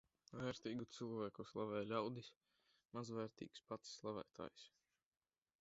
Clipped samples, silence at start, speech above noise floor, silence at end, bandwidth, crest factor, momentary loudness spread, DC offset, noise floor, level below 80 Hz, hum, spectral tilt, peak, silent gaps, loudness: under 0.1%; 0.3 s; over 41 dB; 0.9 s; 7.6 kHz; 22 dB; 12 LU; under 0.1%; under -90 dBFS; -80 dBFS; none; -5 dB/octave; -28 dBFS; 2.37-2.41 s; -49 LUFS